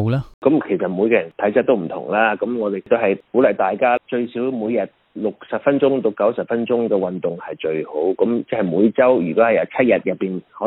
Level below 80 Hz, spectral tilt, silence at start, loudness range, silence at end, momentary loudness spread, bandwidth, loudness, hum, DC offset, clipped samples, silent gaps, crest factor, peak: -58 dBFS; -10 dB/octave; 0 s; 2 LU; 0 s; 8 LU; 4.4 kHz; -19 LUFS; none; under 0.1%; under 0.1%; 0.34-0.42 s; 16 dB; -2 dBFS